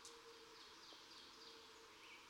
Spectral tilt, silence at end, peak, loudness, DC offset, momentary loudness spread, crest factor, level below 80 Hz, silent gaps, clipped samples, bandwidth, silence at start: -1 dB/octave; 0 s; -40 dBFS; -59 LUFS; under 0.1%; 2 LU; 20 dB; -86 dBFS; none; under 0.1%; 19.5 kHz; 0 s